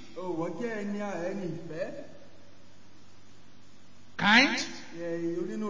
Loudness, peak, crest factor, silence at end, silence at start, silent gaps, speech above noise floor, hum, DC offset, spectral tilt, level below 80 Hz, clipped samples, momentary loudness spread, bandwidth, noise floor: -29 LUFS; -8 dBFS; 24 dB; 0 s; 0 s; none; 28 dB; none; 0.8%; -4 dB/octave; -68 dBFS; under 0.1%; 18 LU; 7.6 kHz; -58 dBFS